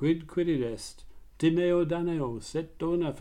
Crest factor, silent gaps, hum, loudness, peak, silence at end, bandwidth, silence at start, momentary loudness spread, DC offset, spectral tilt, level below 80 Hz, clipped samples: 14 dB; none; none; -29 LUFS; -14 dBFS; 0 s; 11.5 kHz; 0 s; 10 LU; under 0.1%; -7 dB/octave; -52 dBFS; under 0.1%